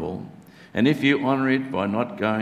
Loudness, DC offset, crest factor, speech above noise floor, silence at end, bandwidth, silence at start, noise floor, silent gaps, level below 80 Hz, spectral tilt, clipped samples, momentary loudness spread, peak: -23 LUFS; under 0.1%; 18 dB; 22 dB; 0 s; 13 kHz; 0 s; -44 dBFS; none; -56 dBFS; -7 dB/octave; under 0.1%; 13 LU; -6 dBFS